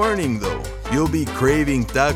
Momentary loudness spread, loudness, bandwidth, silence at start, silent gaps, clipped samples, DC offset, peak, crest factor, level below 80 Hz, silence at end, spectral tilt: 7 LU; -20 LUFS; 16.5 kHz; 0 s; none; under 0.1%; under 0.1%; -2 dBFS; 18 dB; -32 dBFS; 0 s; -5.5 dB/octave